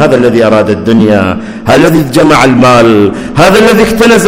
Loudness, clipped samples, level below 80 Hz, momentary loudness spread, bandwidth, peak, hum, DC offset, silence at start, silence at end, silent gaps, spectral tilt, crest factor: -6 LUFS; 10%; -30 dBFS; 5 LU; 18 kHz; 0 dBFS; none; under 0.1%; 0 s; 0 s; none; -5.5 dB/octave; 6 dB